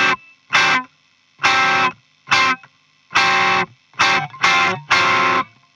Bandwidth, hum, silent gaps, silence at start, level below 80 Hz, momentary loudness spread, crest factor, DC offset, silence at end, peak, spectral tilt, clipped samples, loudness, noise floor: 12 kHz; none; none; 0 s; -58 dBFS; 7 LU; 18 dB; under 0.1%; 0.3 s; 0 dBFS; -2 dB/octave; under 0.1%; -16 LUFS; -57 dBFS